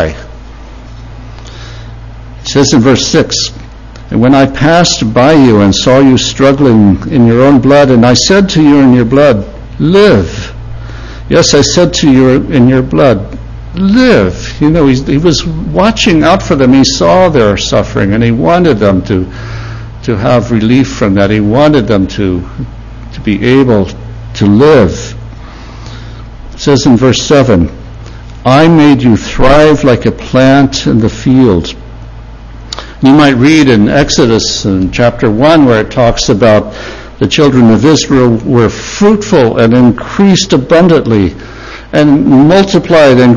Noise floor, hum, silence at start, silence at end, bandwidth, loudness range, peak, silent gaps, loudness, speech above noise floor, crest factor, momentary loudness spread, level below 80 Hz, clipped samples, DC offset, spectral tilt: -27 dBFS; none; 0 s; 0 s; 8.4 kHz; 4 LU; 0 dBFS; none; -7 LUFS; 21 dB; 8 dB; 18 LU; -26 dBFS; 3%; under 0.1%; -5.5 dB/octave